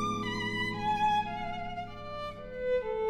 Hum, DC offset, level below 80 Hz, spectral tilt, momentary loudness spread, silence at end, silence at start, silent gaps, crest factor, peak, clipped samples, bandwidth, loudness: none; under 0.1%; -50 dBFS; -5 dB/octave; 12 LU; 0 s; 0 s; none; 14 dB; -20 dBFS; under 0.1%; 14.5 kHz; -33 LUFS